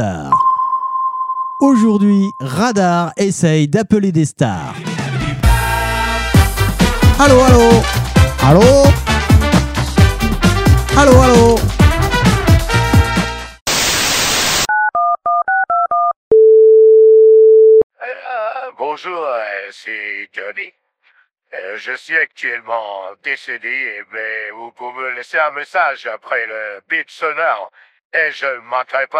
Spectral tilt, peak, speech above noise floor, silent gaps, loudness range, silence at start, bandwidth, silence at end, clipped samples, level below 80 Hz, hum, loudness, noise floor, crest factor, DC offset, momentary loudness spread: -5 dB/octave; 0 dBFS; 42 dB; 13.61-13.66 s, 16.16-16.31 s, 17.83-17.90 s, 28.05-28.10 s; 12 LU; 0 s; 16.5 kHz; 0 s; under 0.1%; -24 dBFS; none; -13 LUFS; -56 dBFS; 12 dB; under 0.1%; 16 LU